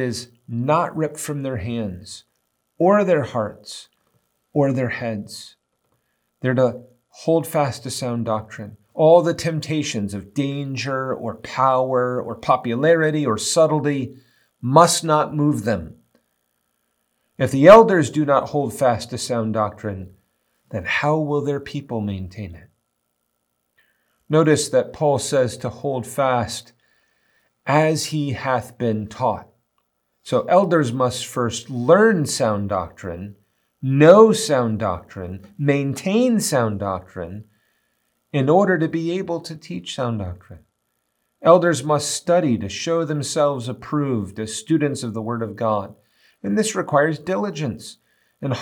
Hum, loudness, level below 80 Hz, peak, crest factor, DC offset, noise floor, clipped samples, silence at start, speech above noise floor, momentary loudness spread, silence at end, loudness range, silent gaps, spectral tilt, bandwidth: none; -20 LUFS; -60 dBFS; 0 dBFS; 20 dB; under 0.1%; -73 dBFS; under 0.1%; 0 s; 54 dB; 17 LU; 0 s; 7 LU; none; -5.5 dB/octave; 18 kHz